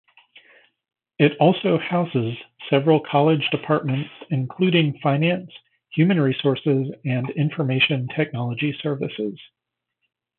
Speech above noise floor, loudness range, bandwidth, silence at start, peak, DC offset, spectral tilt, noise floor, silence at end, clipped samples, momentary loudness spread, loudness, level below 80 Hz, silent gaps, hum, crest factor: 59 dB; 3 LU; 4.2 kHz; 1.2 s; -4 dBFS; under 0.1%; -11.5 dB/octave; -80 dBFS; 0.95 s; under 0.1%; 9 LU; -21 LUFS; -68 dBFS; none; none; 18 dB